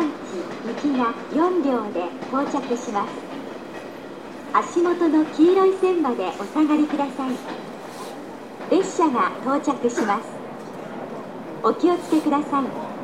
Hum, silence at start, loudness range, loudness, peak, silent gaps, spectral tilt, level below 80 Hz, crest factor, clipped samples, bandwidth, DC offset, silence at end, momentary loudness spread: none; 0 s; 5 LU; -22 LUFS; -6 dBFS; none; -5.5 dB/octave; -66 dBFS; 18 dB; under 0.1%; 12.5 kHz; 0.2%; 0 s; 16 LU